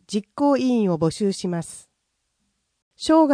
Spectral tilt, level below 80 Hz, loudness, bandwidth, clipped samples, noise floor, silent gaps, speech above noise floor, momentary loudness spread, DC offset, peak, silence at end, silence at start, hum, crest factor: -6 dB/octave; -58 dBFS; -22 LUFS; 10.5 kHz; under 0.1%; -75 dBFS; 2.82-2.91 s; 54 dB; 11 LU; under 0.1%; -6 dBFS; 0 s; 0.1 s; none; 18 dB